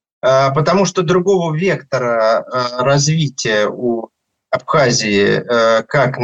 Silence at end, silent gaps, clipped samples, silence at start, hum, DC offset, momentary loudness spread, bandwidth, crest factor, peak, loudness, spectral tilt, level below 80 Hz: 0 s; none; under 0.1%; 0.25 s; none; under 0.1%; 6 LU; 8.4 kHz; 14 dB; -2 dBFS; -15 LUFS; -4.5 dB/octave; -52 dBFS